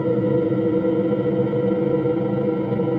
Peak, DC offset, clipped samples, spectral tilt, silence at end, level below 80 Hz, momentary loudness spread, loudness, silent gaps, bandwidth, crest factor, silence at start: -8 dBFS; under 0.1%; under 0.1%; -11 dB/octave; 0 s; -54 dBFS; 2 LU; -21 LUFS; none; 4.6 kHz; 12 dB; 0 s